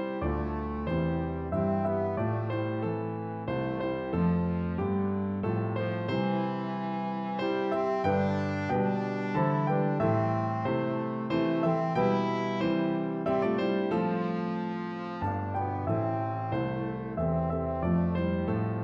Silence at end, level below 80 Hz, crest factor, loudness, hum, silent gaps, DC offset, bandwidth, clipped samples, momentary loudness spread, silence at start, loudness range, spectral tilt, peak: 0 s; -48 dBFS; 14 dB; -30 LUFS; none; none; under 0.1%; 7 kHz; under 0.1%; 5 LU; 0 s; 3 LU; -9 dB/octave; -14 dBFS